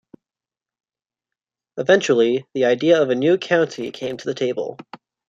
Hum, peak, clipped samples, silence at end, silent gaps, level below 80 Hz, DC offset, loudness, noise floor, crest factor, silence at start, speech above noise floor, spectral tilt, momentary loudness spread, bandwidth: none; -2 dBFS; under 0.1%; 0.35 s; none; -68 dBFS; under 0.1%; -19 LUFS; under -90 dBFS; 18 dB; 1.75 s; over 71 dB; -5 dB/octave; 12 LU; 7.8 kHz